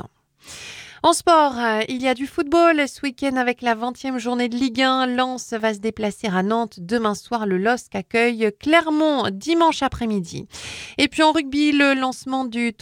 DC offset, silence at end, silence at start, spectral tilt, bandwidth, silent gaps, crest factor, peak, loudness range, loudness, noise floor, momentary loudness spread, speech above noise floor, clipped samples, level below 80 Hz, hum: under 0.1%; 0.1 s; 0.05 s; -4 dB/octave; 16.5 kHz; none; 20 dB; -2 dBFS; 3 LU; -20 LUFS; -45 dBFS; 10 LU; 25 dB; under 0.1%; -52 dBFS; none